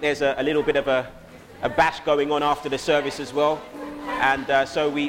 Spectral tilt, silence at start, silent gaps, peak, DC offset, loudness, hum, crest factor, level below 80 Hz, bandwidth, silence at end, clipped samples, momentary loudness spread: -4.5 dB/octave; 0 s; none; -6 dBFS; under 0.1%; -23 LUFS; none; 18 dB; -50 dBFS; 16.5 kHz; 0 s; under 0.1%; 9 LU